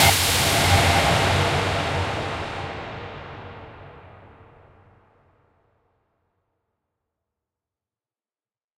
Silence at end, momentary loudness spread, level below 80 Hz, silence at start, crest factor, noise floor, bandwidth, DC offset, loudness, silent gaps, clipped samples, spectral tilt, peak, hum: 4.6 s; 22 LU; -40 dBFS; 0 s; 22 dB; under -90 dBFS; 16 kHz; under 0.1%; -20 LUFS; none; under 0.1%; -3 dB/octave; -4 dBFS; none